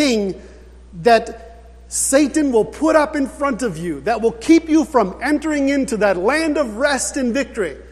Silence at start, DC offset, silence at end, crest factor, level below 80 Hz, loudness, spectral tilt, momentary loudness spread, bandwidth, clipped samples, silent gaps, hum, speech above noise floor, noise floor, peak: 0 s; under 0.1%; 0 s; 18 dB; -42 dBFS; -17 LUFS; -4 dB/octave; 9 LU; 14 kHz; under 0.1%; none; 60 Hz at -40 dBFS; 23 dB; -40 dBFS; 0 dBFS